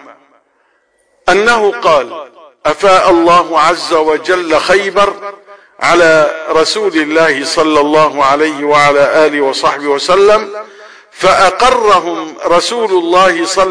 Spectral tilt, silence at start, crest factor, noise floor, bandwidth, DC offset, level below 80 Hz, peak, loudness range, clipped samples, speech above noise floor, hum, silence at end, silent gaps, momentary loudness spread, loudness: -3 dB/octave; 0.05 s; 10 dB; -56 dBFS; 10.5 kHz; 0.7%; -42 dBFS; 0 dBFS; 1 LU; under 0.1%; 46 dB; none; 0 s; none; 7 LU; -10 LUFS